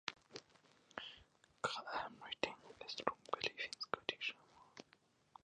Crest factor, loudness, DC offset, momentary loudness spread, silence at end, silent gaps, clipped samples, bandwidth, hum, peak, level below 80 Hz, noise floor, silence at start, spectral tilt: 30 dB; -45 LUFS; under 0.1%; 18 LU; 0.6 s; none; under 0.1%; 10 kHz; none; -18 dBFS; -80 dBFS; -74 dBFS; 0.05 s; -2.5 dB/octave